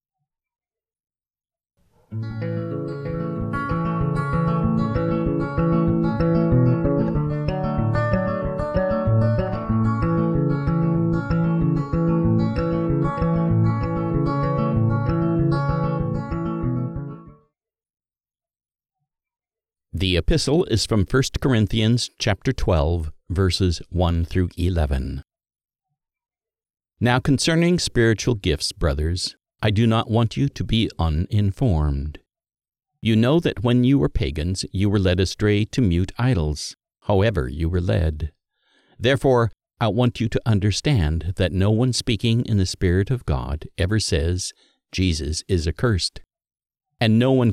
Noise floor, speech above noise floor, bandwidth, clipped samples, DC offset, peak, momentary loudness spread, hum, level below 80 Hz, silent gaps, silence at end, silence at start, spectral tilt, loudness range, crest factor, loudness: under -90 dBFS; over 70 dB; 13 kHz; under 0.1%; under 0.1%; -6 dBFS; 8 LU; none; -34 dBFS; 17.90-17.94 s; 0 s; 2.1 s; -6.5 dB/octave; 5 LU; 16 dB; -21 LUFS